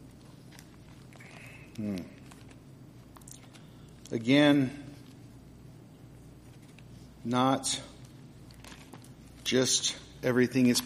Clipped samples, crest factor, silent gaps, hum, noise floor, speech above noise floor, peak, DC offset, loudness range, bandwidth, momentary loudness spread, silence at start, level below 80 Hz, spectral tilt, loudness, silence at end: under 0.1%; 22 dB; none; none; -51 dBFS; 25 dB; -10 dBFS; under 0.1%; 13 LU; 15.5 kHz; 27 LU; 0.05 s; -60 dBFS; -4 dB/octave; -28 LUFS; 0 s